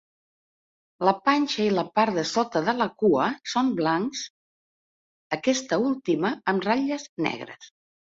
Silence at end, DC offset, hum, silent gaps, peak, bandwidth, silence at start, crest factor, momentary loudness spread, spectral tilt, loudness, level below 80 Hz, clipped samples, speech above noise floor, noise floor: 0.45 s; under 0.1%; none; 4.30-5.30 s, 7.09-7.17 s; -6 dBFS; 7.8 kHz; 1 s; 20 dB; 7 LU; -4.5 dB/octave; -25 LUFS; -68 dBFS; under 0.1%; over 66 dB; under -90 dBFS